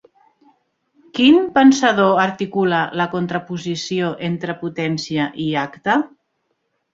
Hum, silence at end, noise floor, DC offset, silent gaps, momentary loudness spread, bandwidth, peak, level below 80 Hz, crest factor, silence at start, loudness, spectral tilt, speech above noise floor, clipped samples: none; 0.85 s; -70 dBFS; under 0.1%; none; 12 LU; 7.8 kHz; -2 dBFS; -60 dBFS; 16 dB; 1.15 s; -18 LUFS; -5.5 dB/octave; 53 dB; under 0.1%